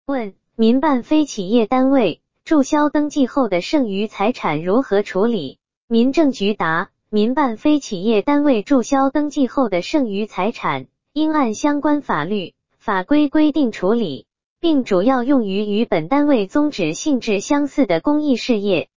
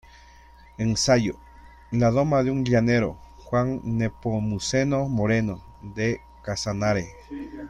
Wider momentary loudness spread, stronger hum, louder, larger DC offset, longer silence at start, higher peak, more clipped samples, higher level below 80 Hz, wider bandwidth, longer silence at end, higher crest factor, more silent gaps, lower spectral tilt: second, 7 LU vs 15 LU; neither; first, -18 LUFS vs -24 LUFS; first, 2% vs under 0.1%; second, 0.05 s vs 0.8 s; first, -4 dBFS vs -8 dBFS; neither; second, -52 dBFS vs -46 dBFS; second, 7.6 kHz vs 11 kHz; about the same, 0 s vs 0 s; about the same, 14 dB vs 18 dB; first, 5.77-5.88 s, 14.46-14.56 s vs none; about the same, -5.5 dB/octave vs -5.5 dB/octave